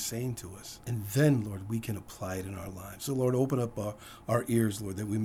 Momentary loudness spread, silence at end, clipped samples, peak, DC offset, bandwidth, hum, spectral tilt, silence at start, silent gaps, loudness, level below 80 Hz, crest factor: 14 LU; 0 s; under 0.1%; -12 dBFS; under 0.1%; over 20 kHz; none; -6 dB/octave; 0 s; none; -32 LUFS; -58 dBFS; 20 dB